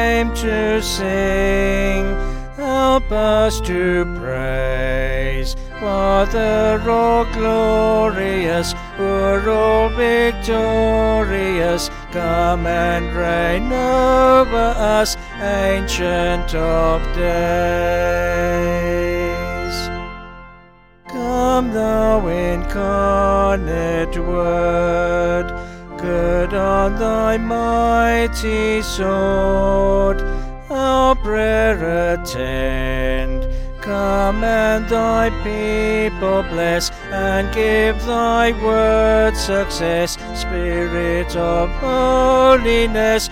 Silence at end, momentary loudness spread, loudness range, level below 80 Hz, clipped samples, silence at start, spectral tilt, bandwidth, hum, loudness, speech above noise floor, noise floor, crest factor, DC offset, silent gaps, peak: 0 s; 8 LU; 3 LU; -26 dBFS; under 0.1%; 0 s; -5 dB/octave; 16.5 kHz; none; -17 LUFS; 30 dB; -47 dBFS; 14 dB; under 0.1%; none; -2 dBFS